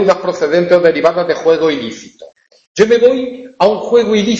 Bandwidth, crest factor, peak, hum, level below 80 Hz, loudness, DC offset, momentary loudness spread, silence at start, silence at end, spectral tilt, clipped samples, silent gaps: 7.8 kHz; 12 dB; 0 dBFS; none; -52 dBFS; -12 LUFS; under 0.1%; 13 LU; 0 s; 0 s; -5 dB/octave; under 0.1%; 2.67-2.75 s